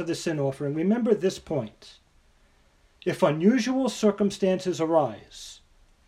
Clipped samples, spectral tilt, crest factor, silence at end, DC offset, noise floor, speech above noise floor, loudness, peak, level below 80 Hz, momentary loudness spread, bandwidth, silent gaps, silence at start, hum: under 0.1%; -6 dB/octave; 18 dB; 0.55 s; under 0.1%; -61 dBFS; 36 dB; -25 LUFS; -8 dBFS; -60 dBFS; 15 LU; 13.5 kHz; none; 0 s; none